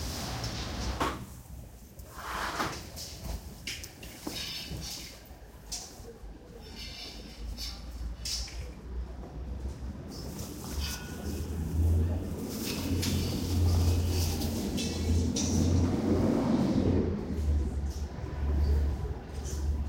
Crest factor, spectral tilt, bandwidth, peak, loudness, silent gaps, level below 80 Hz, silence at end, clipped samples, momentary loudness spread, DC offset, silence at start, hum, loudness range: 16 dB; -5.5 dB/octave; 16.5 kHz; -16 dBFS; -33 LUFS; none; -38 dBFS; 0 s; under 0.1%; 16 LU; under 0.1%; 0 s; none; 11 LU